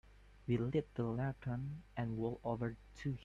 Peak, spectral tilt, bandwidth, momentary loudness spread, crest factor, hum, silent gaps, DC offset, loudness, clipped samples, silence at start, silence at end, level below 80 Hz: -24 dBFS; -9 dB/octave; 7.6 kHz; 7 LU; 16 dB; none; none; under 0.1%; -41 LUFS; under 0.1%; 0.05 s; 0 s; -60 dBFS